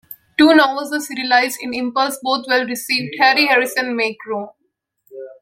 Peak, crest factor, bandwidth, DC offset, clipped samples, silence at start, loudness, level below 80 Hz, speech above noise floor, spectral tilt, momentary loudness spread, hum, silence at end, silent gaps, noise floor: 0 dBFS; 18 dB; 16.5 kHz; under 0.1%; under 0.1%; 0.1 s; -16 LUFS; -64 dBFS; 47 dB; -2.5 dB/octave; 15 LU; none; 0.1 s; none; -64 dBFS